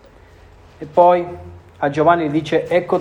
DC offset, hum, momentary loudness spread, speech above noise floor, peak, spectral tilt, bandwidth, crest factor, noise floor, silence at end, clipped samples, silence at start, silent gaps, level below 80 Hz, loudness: under 0.1%; none; 17 LU; 29 dB; 0 dBFS; -7 dB/octave; 9.6 kHz; 16 dB; -45 dBFS; 0 s; under 0.1%; 0.8 s; none; -50 dBFS; -16 LUFS